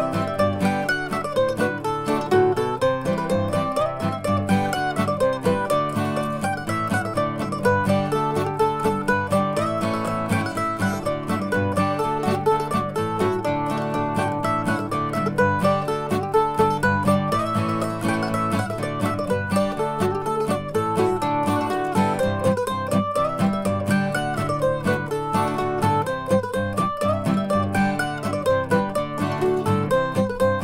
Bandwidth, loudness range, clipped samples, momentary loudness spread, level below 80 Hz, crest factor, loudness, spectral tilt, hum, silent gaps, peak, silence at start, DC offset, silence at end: 16 kHz; 1 LU; under 0.1%; 4 LU; -46 dBFS; 16 dB; -22 LUFS; -6.5 dB/octave; none; none; -6 dBFS; 0 s; under 0.1%; 0 s